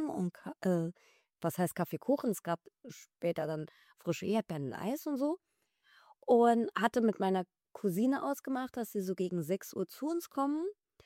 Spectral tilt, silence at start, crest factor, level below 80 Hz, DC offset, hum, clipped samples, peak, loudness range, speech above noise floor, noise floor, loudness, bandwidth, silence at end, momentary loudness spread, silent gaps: -6.5 dB/octave; 0 s; 20 dB; -78 dBFS; under 0.1%; none; under 0.1%; -14 dBFS; 5 LU; 36 dB; -69 dBFS; -34 LUFS; 16.5 kHz; 0.35 s; 12 LU; none